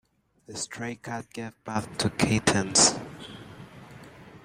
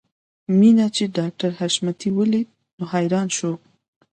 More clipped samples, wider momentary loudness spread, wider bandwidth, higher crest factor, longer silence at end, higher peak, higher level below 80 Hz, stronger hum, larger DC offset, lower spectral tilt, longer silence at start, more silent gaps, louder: neither; first, 26 LU vs 16 LU; first, 16 kHz vs 9.4 kHz; first, 24 dB vs 16 dB; second, 0.05 s vs 0.55 s; about the same, -6 dBFS vs -4 dBFS; first, -56 dBFS vs -66 dBFS; neither; neither; second, -3 dB/octave vs -5.5 dB/octave; about the same, 0.5 s vs 0.5 s; second, none vs 2.73-2.78 s; second, -25 LUFS vs -20 LUFS